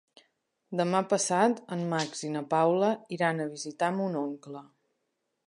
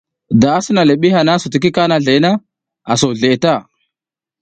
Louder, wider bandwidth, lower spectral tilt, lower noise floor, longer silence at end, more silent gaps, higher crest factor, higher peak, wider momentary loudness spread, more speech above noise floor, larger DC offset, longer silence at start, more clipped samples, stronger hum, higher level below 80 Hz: second, -29 LUFS vs -13 LUFS; first, 11 kHz vs 9.4 kHz; about the same, -4.5 dB/octave vs -5.5 dB/octave; second, -80 dBFS vs -88 dBFS; about the same, 0.8 s vs 0.8 s; neither; first, 20 dB vs 14 dB; second, -10 dBFS vs 0 dBFS; first, 11 LU vs 6 LU; second, 52 dB vs 76 dB; neither; first, 0.7 s vs 0.3 s; neither; neither; second, -82 dBFS vs -50 dBFS